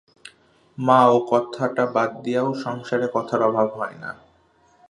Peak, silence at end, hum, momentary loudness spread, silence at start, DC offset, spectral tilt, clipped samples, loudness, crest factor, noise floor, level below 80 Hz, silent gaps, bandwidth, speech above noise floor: -2 dBFS; 0.75 s; none; 14 LU; 0.8 s; under 0.1%; -6.5 dB/octave; under 0.1%; -21 LUFS; 20 dB; -59 dBFS; -70 dBFS; none; 10.5 kHz; 38 dB